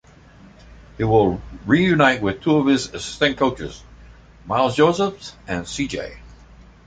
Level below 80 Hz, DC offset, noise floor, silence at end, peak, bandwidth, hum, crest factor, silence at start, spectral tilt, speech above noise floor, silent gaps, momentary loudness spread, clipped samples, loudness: -44 dBFS; under 0.1%; -47 dBFS; 0.6 s; -2 dBFS; 9.4 kHz; none; 18 dB; 0.7 s; -5.5 dB/octave; 27 dB; none; 14 LU; under 0.1%; -20 LUFS